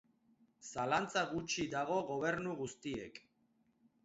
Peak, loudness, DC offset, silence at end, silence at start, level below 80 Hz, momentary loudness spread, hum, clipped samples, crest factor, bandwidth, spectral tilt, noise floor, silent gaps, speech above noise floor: -20 dBFS; -38 LUFS; under 0.1%; 0.85 s; 0.6 s; -70 dBFS; 13 LU; none; under 0.1%; 20 dB; 8 kHz; -3.5 dB/octave; -76 dBFS; none; 38 dB